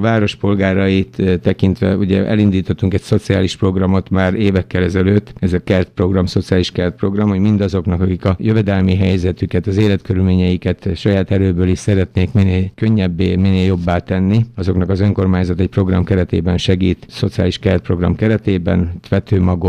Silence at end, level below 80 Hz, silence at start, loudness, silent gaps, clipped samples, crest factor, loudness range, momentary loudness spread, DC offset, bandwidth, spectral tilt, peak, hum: 0 s; -36 dBFS; 0 s; -15 LUFS; none; under 0.1%; 14 dB; 1 LU; 3 LU; under 0.1%; 9.4 kHz; -8 dB/octave; -2 dBFS; none